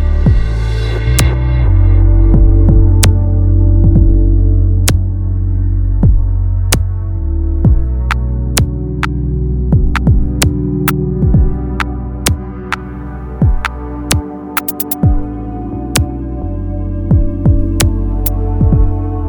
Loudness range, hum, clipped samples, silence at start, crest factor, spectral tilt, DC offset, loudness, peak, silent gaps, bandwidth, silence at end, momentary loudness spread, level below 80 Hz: 7 LU; none; under 0.1%; 0 s; 10 dB; -5.5 dB/octave; under 0.1%; -14 LUFS; 0 dBFS; none; 19 kHz; 0 s; 10 LU; -14 dBFS